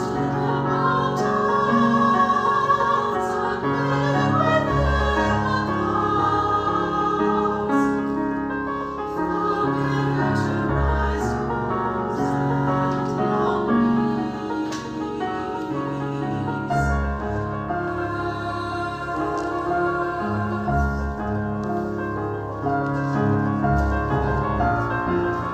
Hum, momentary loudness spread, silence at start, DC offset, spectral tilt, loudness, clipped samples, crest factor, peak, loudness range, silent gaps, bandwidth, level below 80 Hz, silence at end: none; 7 LU; 0 s; under 0.1%; -7.5 dB/octave; -22 LUFS; under 0.1%; 16 dB; -6 dBFS; 5 LU; none; 9.2 kHz; -34 dBFS; 0 s